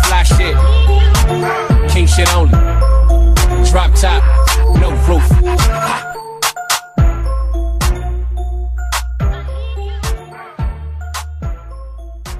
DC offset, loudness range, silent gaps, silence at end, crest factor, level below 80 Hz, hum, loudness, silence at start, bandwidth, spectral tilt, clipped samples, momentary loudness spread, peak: under 0.1%; 10 LU; none; 0 s; 12 dB; -12 dBFS; none; -14 LUFS; 0 s; 15 kHz; -5 dB/octave; under 0.1%; 14 LU; 0 dBFS